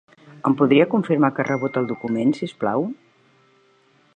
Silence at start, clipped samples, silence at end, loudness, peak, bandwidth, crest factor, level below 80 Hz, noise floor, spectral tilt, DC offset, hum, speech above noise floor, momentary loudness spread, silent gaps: 0.35 s; under 0.1%; 1.2 s; -21 LUFS; -2 dBFS; 8.8 kHz; 20 dB; -68 dBFS; -58 dBFS; -8 dB/octave; under 0.1%; none; 39 dB; 9 LU; none